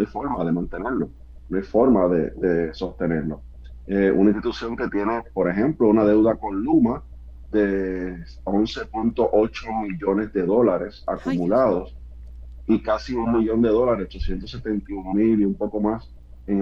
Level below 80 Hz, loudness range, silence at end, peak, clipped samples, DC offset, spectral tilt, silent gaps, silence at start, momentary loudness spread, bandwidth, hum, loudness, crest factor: -40 dBFS; 3 LU; 0 s; -6 dBFS; under 0.1%; under 0.1%; -8.5 dB/octave; none; 0 s; 13 LU; 7 kHz; none; -22 LUFS; 16 dB